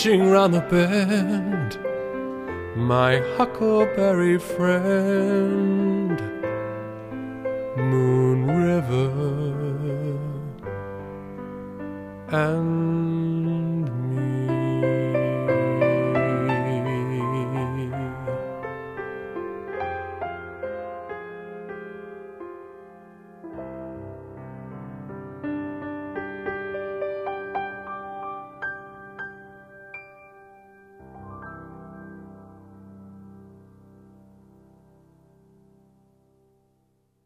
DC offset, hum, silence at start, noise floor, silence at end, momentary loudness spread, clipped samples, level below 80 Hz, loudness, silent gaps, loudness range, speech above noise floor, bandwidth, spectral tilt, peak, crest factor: under 0.1%; none; 0 s; -67 dBFS; 3.65 s; 20 LU; under 0.1%; -56 dBFS; -24 LUFS; none; 18 LU; 47 dB; 15 kHz; -7.5 dB/octave; -6 dBFS; 20 dB